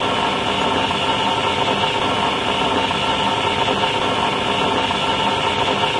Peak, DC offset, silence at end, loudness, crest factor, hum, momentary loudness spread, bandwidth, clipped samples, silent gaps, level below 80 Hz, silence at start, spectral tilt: -4 dBFS; under 0.1%; 0 s; -18 LUFS; 14 dB; none; 1 LU; 11.5 kHz; under 0.1%; none; -44 dBFS; 0 s; -3.5 dB/octave